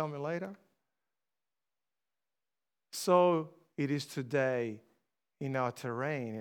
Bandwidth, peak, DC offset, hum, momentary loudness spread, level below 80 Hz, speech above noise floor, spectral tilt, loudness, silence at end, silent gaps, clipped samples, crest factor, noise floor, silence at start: 18 kHz; -14 dBFS; under 0.1%; none; 17 LU; -90 dBFS; over 57 dB; -6 dB/octave; -33 LUFS; 0 s; none; under 0.1%; 22 dB; under -90 dBFS; 0 s